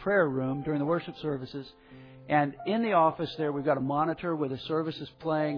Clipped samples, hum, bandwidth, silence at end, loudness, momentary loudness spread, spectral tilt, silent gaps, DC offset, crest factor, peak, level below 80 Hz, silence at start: under 0.1%; none; 5.4 kHz; 0 s; -29 LUFS; 11 LU; -9 dB/octave; none; under 0.1%; 16 dB; -12 dBFS; -62 dBFS; 0 s